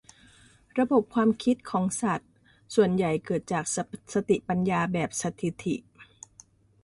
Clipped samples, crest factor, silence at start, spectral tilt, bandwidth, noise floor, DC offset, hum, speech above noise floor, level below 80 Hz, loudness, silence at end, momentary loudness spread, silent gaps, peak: under 0.1%; 18 dB; 0.75 s; -5.5 dB/octave; 11.5 kHz; -57 dBFS; under 0.1%; none; 31 dB; -62 dBFS; -27 LUFS; 0.8 s; 10 LU; none; -10 dBFS